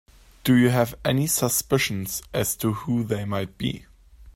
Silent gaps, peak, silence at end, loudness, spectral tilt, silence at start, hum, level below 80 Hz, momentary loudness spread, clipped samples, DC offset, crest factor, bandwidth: none; -6 dBFS; 0.05 s; -24 LUFS; -4.5 dB/octave; 0.45 s; none; -50 dBFS; 10 LU; under 0.1%; under 0.1%; 18 dB; 16.5 kHz